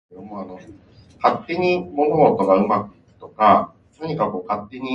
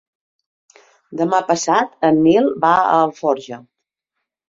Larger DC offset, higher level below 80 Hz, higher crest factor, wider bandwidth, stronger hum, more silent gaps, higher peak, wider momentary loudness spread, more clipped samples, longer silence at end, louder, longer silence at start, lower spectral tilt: neither; about the same, -56 dBFS vs -60 dBFS; about the same, 20 dB vs 16 dB; about the same, 7.6 kHz vs 7.8 kHz; neither; neither; about the same, 0 dBFS vs -2 dBFS; first, 19 LU vs 13 LU; neither; second, 0 s vs 0.9 s; second, -19 LUFS vs -16 LUFS; second, 0.15 s vs 1.1 s; first, -8 dB/octave vs -5 dB/octave